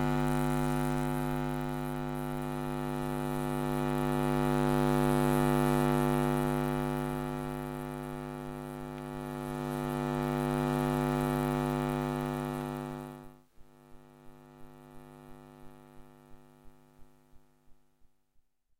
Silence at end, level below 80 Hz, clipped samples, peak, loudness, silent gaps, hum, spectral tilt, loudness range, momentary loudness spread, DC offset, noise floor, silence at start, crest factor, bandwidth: 1.05 s; -46 dBFS; under 0.1%; -14 dBFS; -32 LUFS; none; none; -7 dB/octave; 9 LU; 13 LU; under 0.1%; -68 dBFS; 0 s; 20 dB; 17 kHz